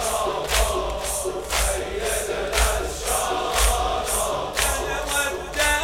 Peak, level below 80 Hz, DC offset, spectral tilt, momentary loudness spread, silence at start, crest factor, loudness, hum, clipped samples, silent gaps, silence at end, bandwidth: -4 dBFS; -30 dBFS; under 0.1%; -2 dB/octave; 5 LU; 0 s; 20 dB; -23 LUFS; none; under 0.1%; none; 0 s; 17 kHz